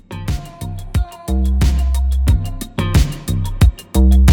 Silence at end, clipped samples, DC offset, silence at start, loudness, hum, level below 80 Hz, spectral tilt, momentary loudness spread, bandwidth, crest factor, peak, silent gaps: 0 s; under 0.1%; under 0.1%; 0.1 s; -18 LUFS; none; -16 dBFS; -6.5 dB/octave; 10 LU; 17.5 kHz; 14 dB; 0 dBFS; none